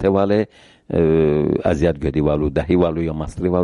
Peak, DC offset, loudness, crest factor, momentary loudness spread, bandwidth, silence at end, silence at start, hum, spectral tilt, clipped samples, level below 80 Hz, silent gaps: -4 dBFS; under 0.1%; -18 LUFS; 14 dB; 7 LU; 10.5 kHz; 0 s; 0 s; none; -8.5 dB/octave; under 0.1%; -34 dBFS; none